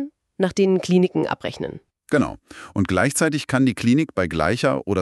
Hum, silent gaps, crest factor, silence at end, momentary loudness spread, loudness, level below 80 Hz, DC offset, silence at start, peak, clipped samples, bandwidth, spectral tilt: none; none; 18 dB; 0 s; 12 LU; -21 LUFS; -48 dBFS; under 0.1%; 0 s; -4 dBFS; under 0.1%; 13.5 kHz; -5.5 dB/octave